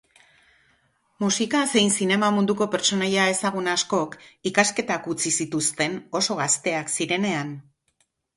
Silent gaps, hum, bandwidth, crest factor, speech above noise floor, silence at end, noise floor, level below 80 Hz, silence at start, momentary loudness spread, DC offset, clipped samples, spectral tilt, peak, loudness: none; none; 11.5 kHz; 20 dB; 47 dB; 0.75 s; -70 dBFS; -66 dBFS; 1.2 s; 7 LU; under 0.1%; under 0.1%; -3 dB/octave; -4 dBFS; -23 LUFS